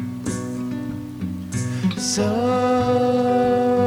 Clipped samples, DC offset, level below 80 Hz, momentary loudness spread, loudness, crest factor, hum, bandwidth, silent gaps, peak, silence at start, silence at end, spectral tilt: under 0.1%; under 0.1%; -50 dBFS; 11 LU; -21 LUFS; 12 dB; none; 19 kHz; none; -8 dBFS; 0 s; 0 s; -5.5 dB/octave